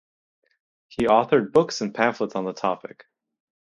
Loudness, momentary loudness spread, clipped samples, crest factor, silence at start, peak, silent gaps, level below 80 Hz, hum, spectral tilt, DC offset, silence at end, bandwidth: -22 LUFS; 13 LU; under 0.1%; 22 dB; 1 s; -2 dBFS; none; -58 dBFS; none; -5 dB/octave; under 0.1%; 0.85 s; 10.5 kHz